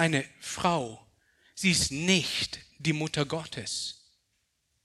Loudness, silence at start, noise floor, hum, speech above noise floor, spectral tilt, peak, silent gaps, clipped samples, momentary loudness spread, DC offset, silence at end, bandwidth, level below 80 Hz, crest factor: -29 LUFS; 0 s; -76 dBFS; none; 47 dB; -3.5 dB/octave; -8 dBFS; none; under 0.1%; 13 LU; under 0.1%; 0.9 s; 13.5 kHz; -58 dBFS; 22 dB